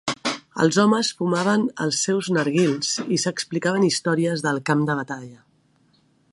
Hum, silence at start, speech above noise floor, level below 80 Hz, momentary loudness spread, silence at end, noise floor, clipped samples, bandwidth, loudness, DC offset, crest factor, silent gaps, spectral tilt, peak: none; 0.05 s; 40 dB; -68 dBFS; 7 LU; 1 s; -61 dBFS; under 0.1%; 11.5 kHz; -22 LUFS; under 0.1%; 18 dB; none; -4.5 dB/octave; -4 dBFS